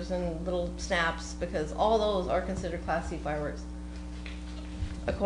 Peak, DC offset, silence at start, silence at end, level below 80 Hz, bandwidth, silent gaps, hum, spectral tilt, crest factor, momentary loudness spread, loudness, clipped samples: -14 dBFS; under 0.1%; 0 s; 0 s; -40 dBFS; 10 kHz; none; 60 Hz at -40 dBFS; -5.5 dB/octave; 18 dB; 14 LU; -32 LUFS; under 0.1%